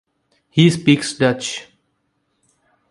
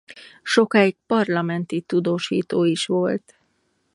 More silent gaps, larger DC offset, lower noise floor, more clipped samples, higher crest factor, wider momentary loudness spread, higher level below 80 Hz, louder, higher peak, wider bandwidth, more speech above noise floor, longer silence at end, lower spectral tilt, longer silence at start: neither; neither; about the same, -69 dBFS vs -68 dBFS; neither; about the same, 20 dB vs 20 dB; first, 12 LU vs 7 LU; first, -58 dBFS vs -70 dBFS; first, -17 LUFS vs -21 LUFS; about the same, 0 dBFS vs -2 dBFS; about the same, 11.5 kHz vs 11.5 kHz; first, 53 dB vs 48 dB; first, 1.3 s vs 0.75 s; about the same, -5.5 dB/octave vs -5.5 dB/octave; first, 0.55 s vs 0.1 s